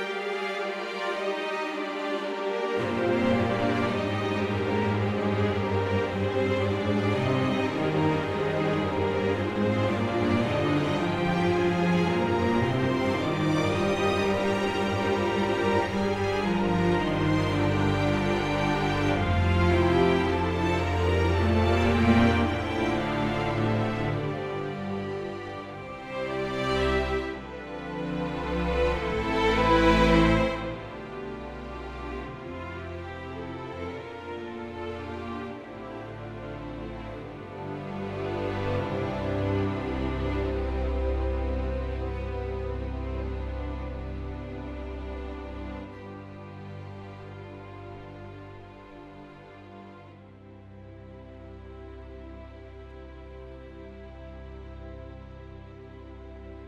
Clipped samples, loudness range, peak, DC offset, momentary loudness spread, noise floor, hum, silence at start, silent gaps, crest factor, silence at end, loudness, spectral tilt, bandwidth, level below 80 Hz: under 0.1%; 20 LU; -8 dBFS; under 0.1%; 20 LU; -48 dBFS; none; 0 s; none; 20 dB; 0 s; -27 LUFS; -7 dB/octave; 12.5 kHz; -40 dBFS